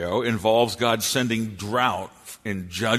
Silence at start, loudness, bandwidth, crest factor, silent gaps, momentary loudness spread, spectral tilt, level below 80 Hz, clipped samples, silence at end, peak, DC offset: 0 s; -23 LUFS; 13.5 kHz; 18 dB; none; 11 LU; -4 dB/octave; -56 dBFS; under 0.1%; 0 s; -6 dBFS; under 0.1%